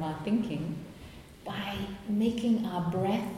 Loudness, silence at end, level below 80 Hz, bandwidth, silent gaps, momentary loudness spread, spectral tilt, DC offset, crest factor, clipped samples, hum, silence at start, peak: -32 LUFS; 0 s; -56 dBFS; 15 kHz; none; 17 LU; -7 dB/octave; under 0.1%; 16 dB; under 0.1%; none; 0 s; -16 dBFS